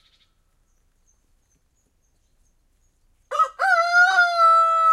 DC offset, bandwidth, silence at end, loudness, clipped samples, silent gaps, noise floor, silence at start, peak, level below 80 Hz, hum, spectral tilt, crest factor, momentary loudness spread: under 0.1%; 12.5 kHz; 0 s; -17 LUFS; under 0.1%; none; -66 dBFS; 3.3 s; -6 dBFS; -64 dBFS; none; 1.5 dB/octave; 16 dB; 8 LU